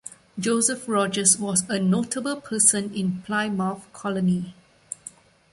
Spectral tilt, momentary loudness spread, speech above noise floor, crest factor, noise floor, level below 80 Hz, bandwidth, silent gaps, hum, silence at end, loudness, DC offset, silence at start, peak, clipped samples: -3.5 dB/octave; 19 LU; 23 dB; 22 dB; -46 dBFS; -62 dBFS; 11.5 kHz; none; none; 0.45 s; -23 LUFS; under 0.1%; 0.05 s; -2 dBFS; under 0.1%